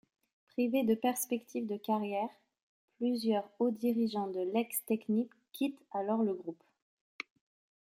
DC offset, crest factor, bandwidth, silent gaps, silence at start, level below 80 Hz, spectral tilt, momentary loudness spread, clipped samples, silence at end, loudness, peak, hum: under 0.1%; 18 dB; 16.5 kHz; 2.63-2.88 s, 6.82-7.19 s; 0.6 s; -84 dBFS; -5 dB/octave; 11 LU; under 0.1%; 0.65 s; -34 LUFS; -18 dBFS; none